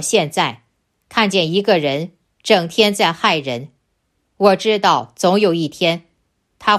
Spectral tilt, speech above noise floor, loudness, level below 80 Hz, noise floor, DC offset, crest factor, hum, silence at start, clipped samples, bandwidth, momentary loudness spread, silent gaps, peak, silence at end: -4 dB/octave; 52 dB; -16 LUFS; -62 dBFS; -68 dBFS; under 0.1%; 16 dB; none; 0 s; under 0.1%; 15 kHz; 10 LU; none; 0 dBFS; 0 s